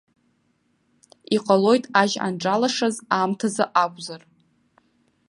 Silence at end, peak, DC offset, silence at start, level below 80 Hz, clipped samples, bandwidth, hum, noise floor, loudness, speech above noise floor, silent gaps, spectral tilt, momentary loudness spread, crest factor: 1.1 s; -2 dBFS; under 0.1%; 1.3 s; -72 dBFS; under 0.1%; 11.5 kHz; none; -67 dBFS; -21 LUFS; 46 dB; none; -4.5 dB/octave; 8 LU; 22 dB